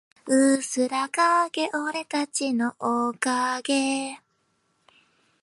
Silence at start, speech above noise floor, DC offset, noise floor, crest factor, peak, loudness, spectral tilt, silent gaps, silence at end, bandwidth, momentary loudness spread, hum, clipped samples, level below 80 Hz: 0.25 s; 46 dB; under 0.1%; -71 dBFS; 18 dB; -6 dBFS; -24 LUFS; -2 dB/octave; none; 1.25 s; 11.5 kHz; 7 LU; none; under 0.1%; -80 dBFS